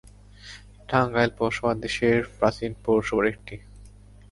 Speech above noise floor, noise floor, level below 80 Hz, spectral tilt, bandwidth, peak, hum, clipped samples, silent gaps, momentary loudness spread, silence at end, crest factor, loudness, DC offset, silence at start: 24 dB; -48 dBFS; -48 dBFS; -6 dB/octave; 11.5 kHz; -6 dBFS; 50 Hz at -50 dBFS; under 0.1%; none; 21 LU; 0.4 s; 20 dB; -24 LUFS; under 0.1%; 0.45 s